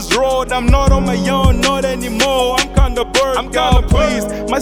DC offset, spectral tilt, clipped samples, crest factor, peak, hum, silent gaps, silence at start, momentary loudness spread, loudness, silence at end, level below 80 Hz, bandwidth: under 0.1%; -4.5 dB/octave; under 0.1%; 14 dB; 0 dBFS; none; none; 0 s; 4 LU; -14 LUFS; 0 s; -18 dBFS; 16.5 kHz